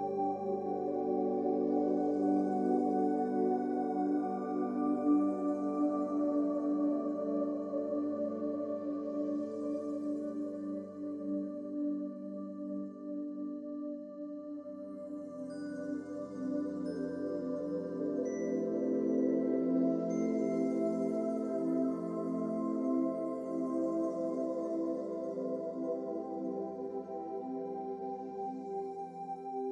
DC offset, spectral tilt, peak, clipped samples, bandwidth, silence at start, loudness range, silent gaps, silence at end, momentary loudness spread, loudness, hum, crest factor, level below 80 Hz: under 0.1%; -9 dB/octave; -18 dBFS; under 0.1%; 8.6 kHz; 0 s; 8 LU; none; 0 s; 10 LU; -35 LUFS; none; 16 dB; -82 dBFS